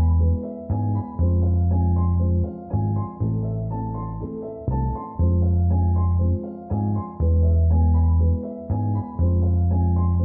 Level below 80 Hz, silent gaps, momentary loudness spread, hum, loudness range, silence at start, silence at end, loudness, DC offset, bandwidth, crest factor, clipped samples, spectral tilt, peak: -28 dBFS; none; 9 LU; none; 4 LU; 0 s; 0 s; -23 LUFS; under 0.1%; 1.8 kHz; 10 dB; under 0.1%; -16 dB/octave; -10 dBFS